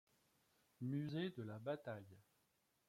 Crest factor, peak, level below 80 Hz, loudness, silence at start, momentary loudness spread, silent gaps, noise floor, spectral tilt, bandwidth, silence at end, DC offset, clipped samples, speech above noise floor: 18 dB; -32 dBFS; -86 dBFS; -48 LUFS; 0.8 s; 10 LU; none; -83 dBFS; -8 dB/octave; 16 kHz; 0.7 s; under 0.1%; under 0.1%; 36 dB